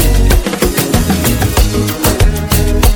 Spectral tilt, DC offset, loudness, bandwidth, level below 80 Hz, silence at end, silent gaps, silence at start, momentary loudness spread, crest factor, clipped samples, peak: -4.5 dB/octave; under 0.1%; -12 LUFS; 17.5 kHz; -14 dBFS; 0 s; none; 0 s; 2 LU; 10 dB; under 0.1%; 0 dBFS